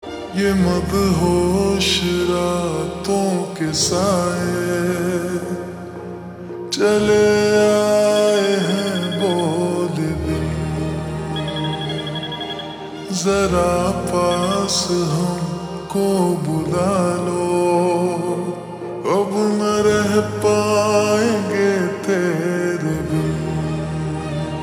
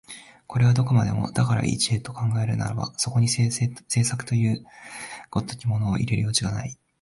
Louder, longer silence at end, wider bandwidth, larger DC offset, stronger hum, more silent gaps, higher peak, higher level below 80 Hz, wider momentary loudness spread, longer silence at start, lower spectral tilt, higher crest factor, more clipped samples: first, -19 LUFS vs -24 LUFS; second, 0 s vs 0.3 s; first, over 20 kHz vs 11.5 kHz; neither; neither; neither; first, -4 dBFS vs -8 dBFS; first, -42 dBFS vs -50 dBFS; second, 10 LU vs 13 LU; about the same, 0 s vs 0.1 s; about the same, -5 dB/octave vs -5 dB/octave; about the same, 14 dB vs 16 dB; neither